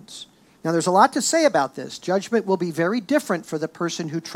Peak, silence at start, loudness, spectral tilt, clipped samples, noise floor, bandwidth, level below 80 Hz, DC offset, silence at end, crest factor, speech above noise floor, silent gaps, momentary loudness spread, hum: -2 dBFS; 0.1 s; -22 LUFS; -4 dB/octave; under 0.1%; -44 dBFS; 17 kHz; -72 dBFS; under 0.1%; 0 s; 20 dB; 22 dB; none; 12 LU; none